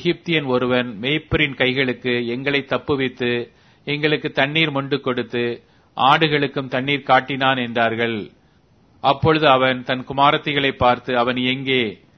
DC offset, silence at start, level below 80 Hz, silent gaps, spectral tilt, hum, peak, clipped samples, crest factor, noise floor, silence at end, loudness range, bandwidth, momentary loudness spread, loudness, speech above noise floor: under 0.1%; 0 s; -48 dBFS; none; -7 dB/octave; none; 0 dBFS; under 0.1%; 20 dB; -55 dBFS; 0.25 s; 3 LU; 6.4 kHz; 8 LU; -19 LUFS; 36 dB